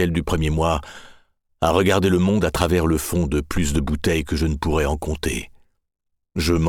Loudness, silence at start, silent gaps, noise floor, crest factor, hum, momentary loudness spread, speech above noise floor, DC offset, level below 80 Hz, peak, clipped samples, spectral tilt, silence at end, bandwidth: -21 LUFS; 0 s; none; -56 dBFS; 18 dB; none; 8 LU; 36 dB; under 0.1%; -30 dBFS; -2 dBFS; under 0.1%; -5.5 dB/octave; 0 s; 18 kHz